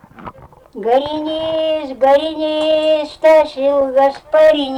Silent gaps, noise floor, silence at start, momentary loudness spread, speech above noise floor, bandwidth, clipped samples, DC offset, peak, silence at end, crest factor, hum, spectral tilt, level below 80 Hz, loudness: none; -36 dBFS; 0.2 s; 9 LU; 22 dB; 10.5 kHz; under 0.1%; under 0.1%; -4 dBFS; 0 s; 10 dB; none; -4.5 dB/octave; -50 dBFS; -14 LUFS